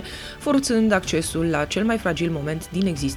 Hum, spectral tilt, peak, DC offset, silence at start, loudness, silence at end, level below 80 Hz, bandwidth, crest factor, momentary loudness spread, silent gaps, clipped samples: none; -5 dB/octave; -4 dBFS; under 0.1%; 0 s; -22 LUFS; 0 s; -42 dBFS; 16 kHz; 18 dB; 8 LU; none; under 0.1%